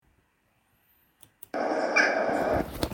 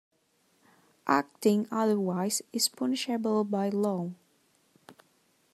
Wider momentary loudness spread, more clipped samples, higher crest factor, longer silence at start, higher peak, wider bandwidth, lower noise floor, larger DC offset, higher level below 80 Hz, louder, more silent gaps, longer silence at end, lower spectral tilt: first, 13 LU vs 4 LU; neither; about the same, 20 dB vs 22 dB; first, 1.55 s vs 1.05 s; about the same, -10 dBFS vs -8 dBFS; first, 17.5 kHz vs 13.5 kHz; about the same, -70 dBFS vs -70 dBFS; neither; first, -50 dBFS vs -82 dBFS; first, -26 LUFS vs -29 LUFS; neither; second, 0 s vs 0.6 s; about the same, -4.5 dB/octave vs -4.5 dB/octave